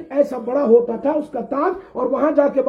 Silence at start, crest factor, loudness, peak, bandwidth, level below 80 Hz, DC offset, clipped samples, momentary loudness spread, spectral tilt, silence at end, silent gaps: 0 s; 16 dB; -19 LUFS; -2 dBFS; 6.8 kHz; -58 dBFS; under 0.1%; under 0.1%; 8 LU; -8 dB/octave; 0 s; none